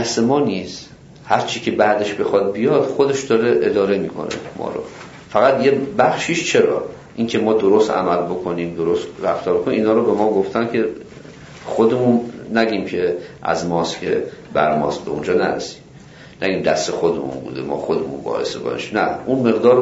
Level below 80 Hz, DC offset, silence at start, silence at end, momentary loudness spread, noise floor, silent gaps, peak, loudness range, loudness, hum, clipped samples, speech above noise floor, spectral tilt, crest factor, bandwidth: -54 dBFS; under 0.1%; 0 s; 0 s; 11 LU; -41 dBFS; none; -2 dBFS; 4 LU; -18 LUFS; none; under 0.1%; 23 dB; -5 dB/octave; 16 dB; 8 kHz